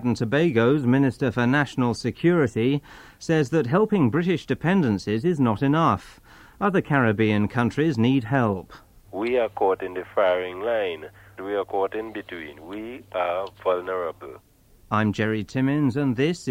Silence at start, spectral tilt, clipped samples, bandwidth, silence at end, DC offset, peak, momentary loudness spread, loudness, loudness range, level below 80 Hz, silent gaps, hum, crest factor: 0 s; -7.5 dB/octave; under 0.1%; 15.5 kHz; 0 s; under 0.1%; -6 dBFS; 12 LU; -23 LUFS; 6 LU; -54 dBFS; none; none; 16 dB